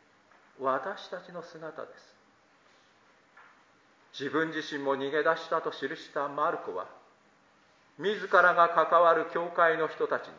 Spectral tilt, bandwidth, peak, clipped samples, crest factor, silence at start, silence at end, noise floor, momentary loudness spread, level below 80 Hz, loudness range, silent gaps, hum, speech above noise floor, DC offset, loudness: -5 dB/octave; 7.6 kHz; -8 dBFS; under 0.1%; 22 dB; 0.6 s; 0 s; -64 dBFS; 20 LU; -86 dBFS; 14 LU; none; none; 35 dB; under 0.1%; -28 LUFS